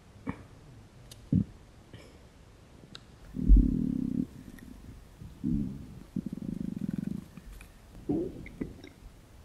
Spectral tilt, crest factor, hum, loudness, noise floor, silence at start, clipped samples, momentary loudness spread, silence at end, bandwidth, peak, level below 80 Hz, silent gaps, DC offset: -8.5 dB/octave; 22 dB; none; -33 LUFS; -55 dBFS; 0.25 s; under 0.1%; 23 LU; 0 s; 10.5 kHz; -10 dBFS; -36 dBFS; none; under 0.1%